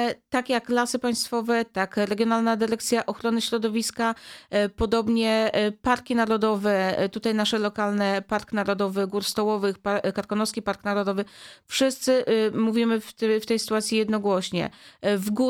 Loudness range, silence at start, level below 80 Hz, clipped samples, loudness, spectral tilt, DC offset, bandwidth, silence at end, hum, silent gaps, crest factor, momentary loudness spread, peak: 2 LU; 0 s; -54 dBFS; under 0.1%; -25 LUFS; -4 dB/octave; under 0.1%; 17 kHz; 0 s; none; none; 16 dB; 5 LU; -8 dBFS